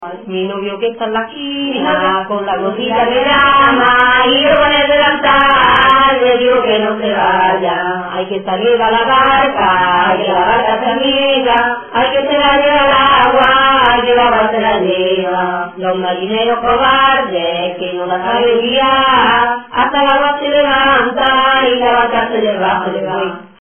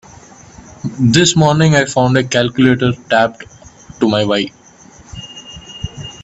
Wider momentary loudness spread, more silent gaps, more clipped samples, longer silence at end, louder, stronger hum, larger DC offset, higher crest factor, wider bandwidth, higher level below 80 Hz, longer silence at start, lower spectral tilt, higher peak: second, 10 LU vs 21 LU; neither; neither; first, 0.15 s vs 0 s; about the same, -11 LUFS vs -13 LUFS; neither; neither; about the same, 12 dB vs 16 dB; second, 3.5 kHz vs 8.4 kHz; about the same, -40 dBFS vs -44 dBFS; second, 0 s vs 0.85 s; first, -6.5 dB/octave vs -5 dB/octave; about the same, 0 dBFS vs 0 dBFS